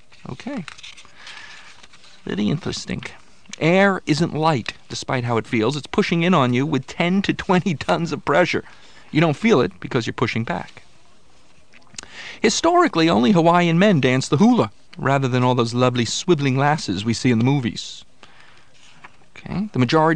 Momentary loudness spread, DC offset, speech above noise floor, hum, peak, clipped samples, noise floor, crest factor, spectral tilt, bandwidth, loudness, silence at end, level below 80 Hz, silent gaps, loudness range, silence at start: 20 LU; 0.7%; 36 dB; none; -2 dBFS; under 0.1%; -55 dBFS; 18 dB; -5.5 dB/octave; 10 kHz; -19 LUFS; 0 s; -52 dBFS; none; 6 LU; 0.3 s